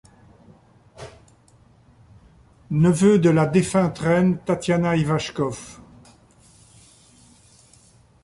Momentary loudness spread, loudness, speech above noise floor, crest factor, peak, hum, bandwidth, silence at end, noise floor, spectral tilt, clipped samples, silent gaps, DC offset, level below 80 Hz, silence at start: 26 LU; -20 LUFS; 35 dB; 18 dB; -6 dBFS; none; 11.5 kHz; 2.5 s; -54 dBFS; -6.5 dB/octave; under 0.1%; none; under 0.1%; -52 dBFS; 1 s